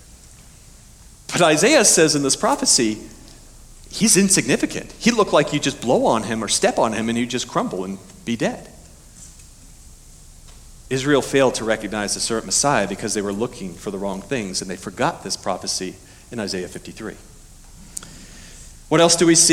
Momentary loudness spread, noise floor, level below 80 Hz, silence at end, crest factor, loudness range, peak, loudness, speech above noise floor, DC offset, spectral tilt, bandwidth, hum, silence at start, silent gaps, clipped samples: 19 LU; -45 dBFS; -46 dBFS; 0 s; 18 dB; 11 LU; -2 dBFS; -19 LUFS; 26 dB; under 0.1%; -3 dB/octave; 18.5 kHz; none; 1.3 s; none; under 0.1%